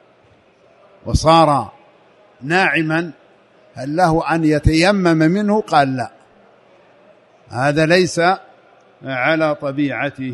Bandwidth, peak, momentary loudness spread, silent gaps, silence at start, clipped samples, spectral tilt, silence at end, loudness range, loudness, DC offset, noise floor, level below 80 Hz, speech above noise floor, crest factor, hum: 11.5 kHz; 0 dBFS; 16 LU; none; 1.05 s; under 0.1%; -5.5 dB/octave; 0 s; 3 LU; -16 LUFS; under 0.1%; -52 dBFS; -36 dBFS; 37 dB; 18 dB; none